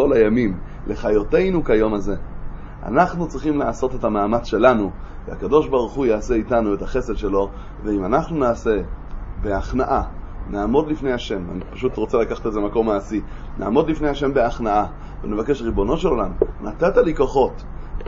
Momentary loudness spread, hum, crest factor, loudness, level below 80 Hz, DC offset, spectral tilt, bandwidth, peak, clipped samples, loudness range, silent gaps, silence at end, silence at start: 13 LU; none; 20 dB; -21 LUFS; -30 dBFS; under 0.1%; -7.5 dB/octave; 7.6 kHz; 0 dBFS; under 0.1%; 3 LU; none; 0 s; 0 s